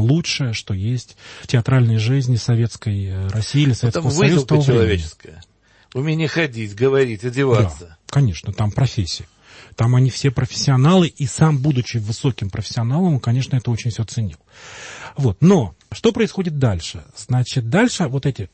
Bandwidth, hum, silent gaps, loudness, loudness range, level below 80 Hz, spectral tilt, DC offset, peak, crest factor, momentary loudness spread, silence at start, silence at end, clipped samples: 8.8 kHz; none; none; -19 LUFS; 3 LU; -44 dBFS; -6 dB/octave; under 0.1%; -2 dBFS; 16 dB; 11 LU; 0 s; 0.05 s; under 0.1%